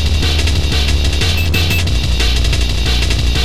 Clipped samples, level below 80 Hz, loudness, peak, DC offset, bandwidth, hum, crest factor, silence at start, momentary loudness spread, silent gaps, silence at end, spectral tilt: under 0.1%; -16 dBFS; -14 LUFS; -2 dBFS; 7%; 15 kHz; none; 10 dB; 0 s; 2 LU; none; 0 s; -4 dB/octave